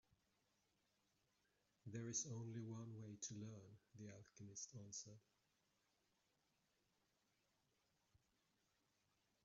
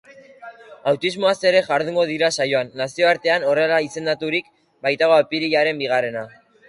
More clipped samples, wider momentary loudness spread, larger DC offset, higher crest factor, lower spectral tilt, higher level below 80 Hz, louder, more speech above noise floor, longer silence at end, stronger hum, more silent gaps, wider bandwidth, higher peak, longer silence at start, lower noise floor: neither; first, 15 LU vs 9 LU; neither; first, 24 dB vs 18 dB; first, -6.5 dB/octave vs -4 dB/octave; second, under -90 dBFS vs -66 dBFS; second, -53 LUFS vs -19 LUFS; first, 32 dB vs 22 dB; first, 4.25 s vs 0.4 s; neither; neither; second, 7.4 kHz vs 11.5 kHz; second, -34 dBFS vs -2 dBFS; first, 1.85 s vs 0.4 s; first, -86 dBFS vs -41 dBFS